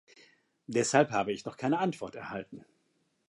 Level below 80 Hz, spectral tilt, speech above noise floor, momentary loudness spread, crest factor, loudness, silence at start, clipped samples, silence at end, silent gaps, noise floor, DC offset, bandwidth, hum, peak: -72 dBFS; -4.5 dB/octave; 44 dB; 16 LU; 24 dB; -31 LUFS; 0.7 s; under 0.1%; 0.7 s; none; -75 dBFS; under 0.1%; 11.5 kHz; none; -10 dBFS